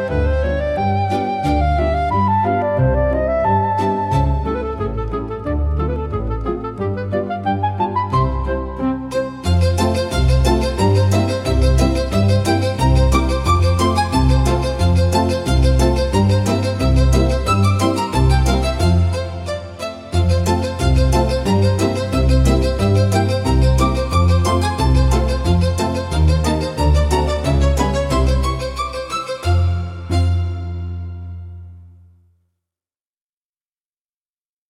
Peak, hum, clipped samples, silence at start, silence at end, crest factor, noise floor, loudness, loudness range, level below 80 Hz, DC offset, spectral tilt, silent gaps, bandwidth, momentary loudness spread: -2 dBFS; none; under 0.1%; 0 s; 2.8 s; 14 dB; under -90 dBFS; -17 LUFS; 6 LU; -22 dBFS; under 0.1%; -6.5 dB/octave; none; 13.5 kHz; 8 LU